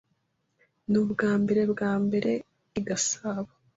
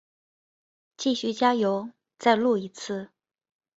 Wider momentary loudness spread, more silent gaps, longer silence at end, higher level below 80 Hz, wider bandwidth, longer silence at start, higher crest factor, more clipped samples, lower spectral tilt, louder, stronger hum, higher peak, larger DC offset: about the same, 11 LU vs 12 LU; neither; second, 0.3 s vs 0.7 s; first, -64 dBFS vs -72 dBFS; about the same, 8 kHz vs 8 kHz; about the same, 0.9 s vs 1 s; second, 16 dB vs 22 dB; neither; about the same, -5 dB/octave vs -4.5 dB/octave; about the same, -27 LUFS vs -26 LUFS; neither; second, -12 dBFS vs -6 dBFS; neither